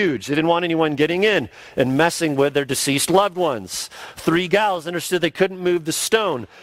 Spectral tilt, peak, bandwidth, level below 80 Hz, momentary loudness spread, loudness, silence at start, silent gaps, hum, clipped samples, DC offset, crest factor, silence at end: -4 dB/octave; -2 dBFS; 16 kHz; -56 dBFS; 7 LU; -20 LUFS; 0 s; none; none; under 0.1%; under 0.1%; 18 dB; 0 s